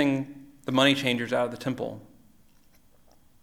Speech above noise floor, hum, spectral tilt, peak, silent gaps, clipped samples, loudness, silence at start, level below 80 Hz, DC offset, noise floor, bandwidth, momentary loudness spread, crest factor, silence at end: 31 dB; none; -5 dB/octave; -6 dBFS; none; under 0.1%; -26 LUFS; 0 s; -64 dBFS; under 0.1%; -57 dBFS; 15.5 kHz; 18 LU; 22 dB; 1.4 s